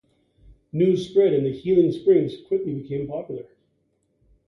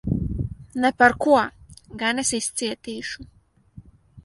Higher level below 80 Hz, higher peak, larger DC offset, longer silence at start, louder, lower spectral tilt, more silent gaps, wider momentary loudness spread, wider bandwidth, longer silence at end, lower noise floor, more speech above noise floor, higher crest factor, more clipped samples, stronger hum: second, -58 dBFS vs -42 dBFS; second, -8 dBFS vs -2 dBFS; neither; first, 0.75 s vs 0.05 s; about the same, -22 LUFS vs -22 LUFS; first, -8.5 dB/octave vs -4 dB/octave; neither; about the same, 13 LU vs 15 LU; second, 6.8 kHz vs 11.5 kHz; first, 1.05 s vs 0.05 s; first, -69 dBFS vs -48 dBFS; first, 48 dB vs 27 dB; second, 16 dB vs 22 dB; neither; neither